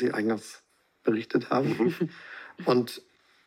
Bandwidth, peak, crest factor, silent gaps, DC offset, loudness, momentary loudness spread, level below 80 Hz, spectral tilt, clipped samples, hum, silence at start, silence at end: 16 kHz; -10 dBFS; 18 dB; none; under 0.1%; -28 LUFS; 17 LU; -82 dBFS; -6.5 dB/octave; under 0.1%; none; 0 s; 0.5 s